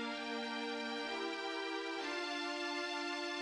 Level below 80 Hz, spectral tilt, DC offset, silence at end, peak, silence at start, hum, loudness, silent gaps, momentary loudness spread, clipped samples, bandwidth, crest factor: -84 dBFS; -1.5 dB/octave; under 0.1%; 0 s; -28 dBFS; 0 s; none; -40 LUFS; none; 1 LU; under 0.1%; 12 kHz; 12 dB